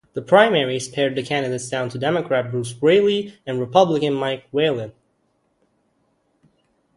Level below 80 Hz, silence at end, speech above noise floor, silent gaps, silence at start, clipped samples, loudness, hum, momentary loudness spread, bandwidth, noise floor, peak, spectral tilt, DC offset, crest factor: -62 dBFS; 2.05 s; 47 dB; none; 0.15 s; under 0.1%; -20 LUFS; none; 11 LU; 11.5 kHz; -67 dBFS; 0 dBFS; -5 dB/octave; under 0.1%; 20 dB